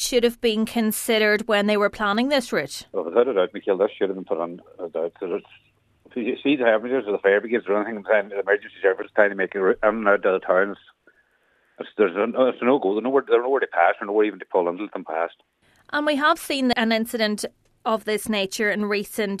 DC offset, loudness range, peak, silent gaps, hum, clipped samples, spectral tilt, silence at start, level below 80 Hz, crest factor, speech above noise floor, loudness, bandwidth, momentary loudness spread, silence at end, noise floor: under 0.1%; 4 LU; -2 dBFS; none; none; under 0.1%; -4 dB/octave; 0 s; -60 dBFS; 20 dB; 42 dB; -22 LUFS; 14 kHz; 10 LU; 0 s; -64 dBFS